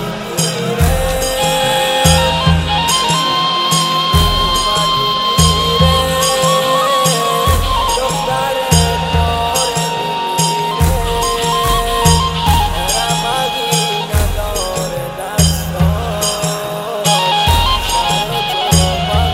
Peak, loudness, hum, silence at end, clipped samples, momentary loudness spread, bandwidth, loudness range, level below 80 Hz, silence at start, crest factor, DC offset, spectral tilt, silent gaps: 0 dBFS; -13 LUFS; none; 0 s; under 0.1%; 5 LU; 16.5 kHz; 4 LU; -22 dBFS; 0 s; 14 dB; under 0.1%; -3.5 dB/octave; none